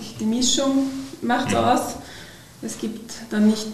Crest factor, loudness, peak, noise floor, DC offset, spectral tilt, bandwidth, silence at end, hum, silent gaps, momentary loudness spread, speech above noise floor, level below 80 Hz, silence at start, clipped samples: 16 dB; -22 LUFS; -6 dBFS; -42 dBFS; under 0.1%; -3.5 dB/octave; 14 kHz; 0 s; none; none; 16 LU; 20 dB; -52 dBFS; 0 s; under 0.1%